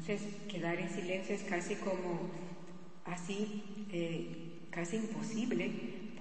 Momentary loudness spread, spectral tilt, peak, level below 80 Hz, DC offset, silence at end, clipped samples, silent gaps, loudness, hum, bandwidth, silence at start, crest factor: 9 LU; -5.5 dB/octave; -20 dBFS; -80 dBFS; 0.4%; 0 s; under 0.1%; none; -40 LUFS; none; 8.4 kHz; 0 s; 18 dB